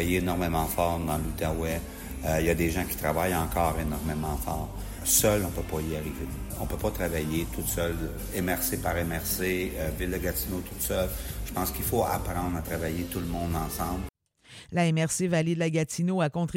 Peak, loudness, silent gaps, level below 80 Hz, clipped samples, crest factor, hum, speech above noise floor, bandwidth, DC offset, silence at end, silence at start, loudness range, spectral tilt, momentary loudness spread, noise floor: -8 dBFS; -29 LUFS; none; -38 dBFS; under 0.1%; 20 dB; none; 23 dB; 16.5 kHz; under 0.1%; 0 s; 0 s; 3 LU; -5 dB/octave; 8 LU; -52 dBFS